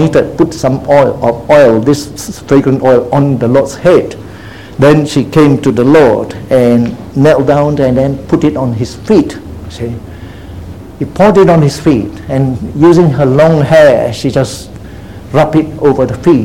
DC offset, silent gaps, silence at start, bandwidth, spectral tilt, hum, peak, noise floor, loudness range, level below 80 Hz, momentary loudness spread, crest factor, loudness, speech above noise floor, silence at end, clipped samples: 0.8%; none; 0 s; 16 kHz; -7 dB/octave; none; 0 dBFS; -28 dBFS; 4 LU; -34 dBFS; 19 LU; 8 dB; -9 LUFS; 20 dB; 0 s; 1%